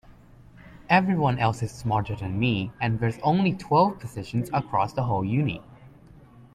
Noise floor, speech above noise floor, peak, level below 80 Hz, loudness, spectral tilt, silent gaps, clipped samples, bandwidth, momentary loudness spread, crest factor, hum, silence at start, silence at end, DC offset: -50 dBFS; 26 dB; -6 dBFS; -52 dBFS; -25 LUFS; -7 dB/octave; none; under 0.1%; 13 kHz; 9 LU; 20 dB; none; 0.1 s; 0.15 s; under 0.1%